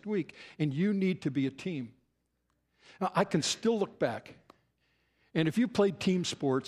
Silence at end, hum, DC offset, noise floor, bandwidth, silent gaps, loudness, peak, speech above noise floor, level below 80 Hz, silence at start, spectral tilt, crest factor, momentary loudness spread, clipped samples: 0 s; none; under 0.1%; -78 dBFS; 13.5 kHz; none; -31 LUFS; -12 dBFS; 47 dB; -72 dBFS; 0.05 s; -5.5 dB/octave; 20 dB; 10 LU; under 0.1%